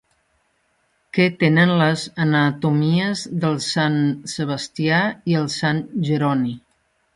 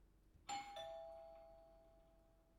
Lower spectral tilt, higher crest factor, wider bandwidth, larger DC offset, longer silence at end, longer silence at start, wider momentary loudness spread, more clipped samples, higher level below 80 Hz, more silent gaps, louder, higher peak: first, -6 dB/octave vs -2 dB/octave; about the same, 16 dB vs 20 dB; second, 11.5 kHz vs 16 kHz; neither; first, 0.6 s vs 0 s; first, 1.15 s vs 0 s; second, 9 LU vs 18 LU; neither; first, -60 dBFS vs -74 dBFS; neither; first, -20 LUFS vs -53 LUFS; first, -4 dBFS vs -36 dBFS